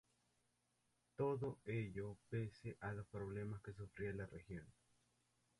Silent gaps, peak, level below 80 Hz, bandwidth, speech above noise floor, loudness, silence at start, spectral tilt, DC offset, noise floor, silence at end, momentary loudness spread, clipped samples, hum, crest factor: none; -32 dBFS; -70 dBFS; 11.5 kHz; 37 dB; -48 LUFS; 1.2 s; -8.5 dB/octave; under 0.1%; -84 dBFS; 0.9 s; 11 LU; under 0.1%; 60 Hz at -75 dBFS; 18 dB